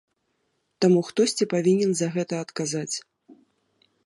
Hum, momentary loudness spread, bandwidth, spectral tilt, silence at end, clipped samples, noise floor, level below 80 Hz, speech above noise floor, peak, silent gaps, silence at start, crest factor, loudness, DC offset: none; 9 LU; 11.5 kHz; -5 dB/octave; 0.7 s; under 0.1%; -73 dBFS; -76 dBFS; 50 dB; -8 dBFS; none; 0.8 s; 18 dB; -24 LUFS; under 0.1%